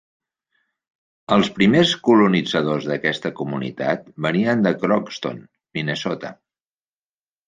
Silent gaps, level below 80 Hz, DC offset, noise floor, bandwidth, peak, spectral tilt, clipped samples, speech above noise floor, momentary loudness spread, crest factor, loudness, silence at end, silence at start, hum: none; -58 dBFS; under 0.1%; under -90 dBFS; 9.4 kHz; -2 dBFS; -6 dB/octave; under 0.1%; over 71 dB; 14 LU; 20 dB; -20 LUFS; 1.15 s; 1.3 s; none